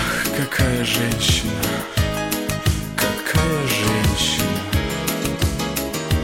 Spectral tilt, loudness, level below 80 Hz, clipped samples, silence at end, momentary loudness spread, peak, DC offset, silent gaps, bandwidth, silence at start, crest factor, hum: -4 dB/octave; -20 LUFS; -30 dBFS; under 0.1%; 0 s; 5 LU; -2 dBFS; under 0.1%; none; 17 kHz; 0 s; 18 dB; none